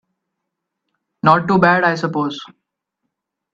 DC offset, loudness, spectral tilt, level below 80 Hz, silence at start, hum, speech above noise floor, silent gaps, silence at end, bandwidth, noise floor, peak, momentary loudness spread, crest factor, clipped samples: under 0.1%; -15 LUFS; -7 dB/octave; -58 dBFS; 1.25 s; none; 63 dB; none; 1.1 s; 7.6 kHz; -78 dBFS; 0 dBFS; 11 LU; 20 dB; under 0.1%